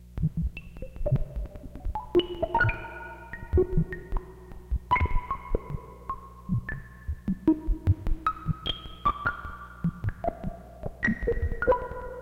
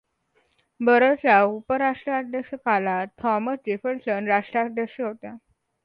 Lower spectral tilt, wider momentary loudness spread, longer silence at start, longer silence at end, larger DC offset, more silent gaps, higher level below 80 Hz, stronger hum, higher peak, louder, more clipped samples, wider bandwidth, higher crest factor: about the same, -8 dB/octave vs -8.5 dB/octave; about the same, 14 LU vs 12 LU; second, 0 s vs 0.8 s; second, 0 s vs 0.45 s; neither; neither; first, -34 dBFS vs -66 dBFS; neither; second, -12 dBFS vs -4 dBFS; second, -30 LUFS vs -23 LUFS; neither; first, 7 kHz vs 5.4 kHz; about the same, 16 dB vs 20 dB